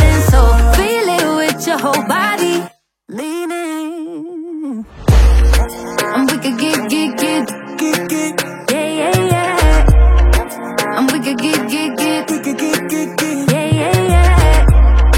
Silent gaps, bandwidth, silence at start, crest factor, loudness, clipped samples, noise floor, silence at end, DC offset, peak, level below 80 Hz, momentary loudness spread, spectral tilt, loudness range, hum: none; 16.5 kHz; 0 s; 12 dB; -14 LUFS; under 0.1%; -35 dBFS; 0 s; under 0.1%; 0 dBFS; -16 dBFS; 12 LU; -5 dB/octave; 4 LU; none